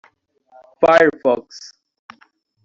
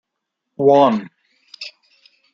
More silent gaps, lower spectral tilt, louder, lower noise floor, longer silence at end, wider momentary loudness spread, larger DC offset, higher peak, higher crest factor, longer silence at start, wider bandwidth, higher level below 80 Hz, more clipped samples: neither; second, -5 dB/octave vs -7 dB/octave; about the same, -15 LUFS vs -15 LUFS; second, -57 dBFS vs -79 dBFS; first, 1.05 s vs 0.65 s; first, 25 LU vs 21 LU; neither; about the same, -2 dBFS vs -2 dBFS; about the same, 18 dB vs 18 dB; first, 0.8 s vs 0.6 s; about the same, 7.6 kHz vs 7.4 kHz; first, -58 dBFS vs -68 dBFS; neither